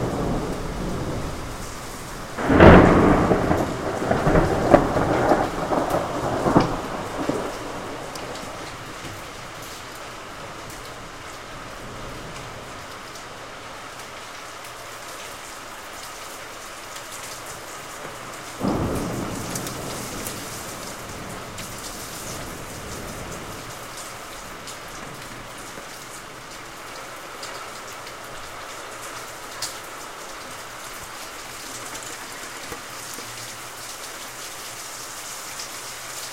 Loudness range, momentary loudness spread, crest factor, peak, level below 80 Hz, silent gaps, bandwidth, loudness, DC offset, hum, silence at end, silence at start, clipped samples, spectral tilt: 18 LU; 16 LU; 26 dB; 0 dBFS; -38 dBFS; none; 16 kHz; -26 LUFS; 0.3%; none; 0 s; 0 s; under 0.1%; -5 dB/octave